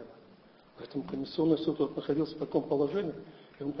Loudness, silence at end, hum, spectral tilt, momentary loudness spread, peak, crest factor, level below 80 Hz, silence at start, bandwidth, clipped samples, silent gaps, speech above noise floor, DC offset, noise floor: -32 LUFS; 0 s; none; -9 dB/octave; 19 LU; -14 dBFS; 20 dB; -66 dBFS; 0 s; 6 kHz; under 0.1%; none; 27 dB; under 0.1%; -58 dBFS